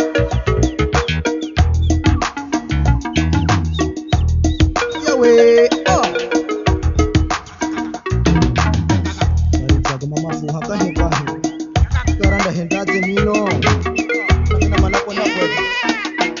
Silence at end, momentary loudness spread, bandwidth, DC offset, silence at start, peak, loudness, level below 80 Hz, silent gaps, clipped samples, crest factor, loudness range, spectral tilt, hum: 0 s; 6 LU; 7.6 kHz; under 0.1%; 0 s; 0 dBFS; -16 LUFS; -22 dBFS; none; under 0.1%; 16 dB; 4 LU; -5.5 dB/octave; none